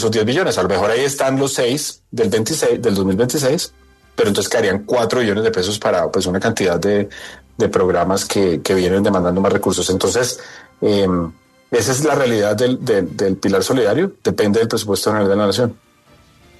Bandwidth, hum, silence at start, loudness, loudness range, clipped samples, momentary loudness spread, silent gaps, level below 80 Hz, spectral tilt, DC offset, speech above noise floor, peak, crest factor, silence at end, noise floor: 13.5 kHz; none; 0 s; -17 LUFS; 1 LU; under 0.1%; 6 LU; none; -50 dBFS; -4.5 dB/octave; under 0.1%; 34 dB; -2 dBFS; 14 dB; 0.85 s; -50 dBFS